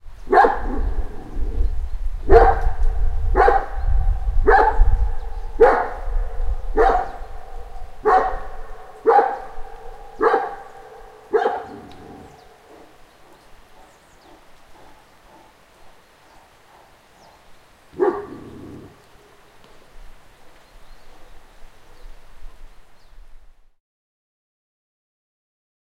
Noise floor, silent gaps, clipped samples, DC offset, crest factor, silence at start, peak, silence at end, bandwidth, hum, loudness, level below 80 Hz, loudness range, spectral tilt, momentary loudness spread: -50 dBFS; none; under 0.1%; under 0.1%; 22 dB; 0.05 s; 0 dBFS; 2.45 s; 6.4 kHz; none; -20 LUFS; -26 dBFS; 12 LU; -7.5 dB/octave; 25 LU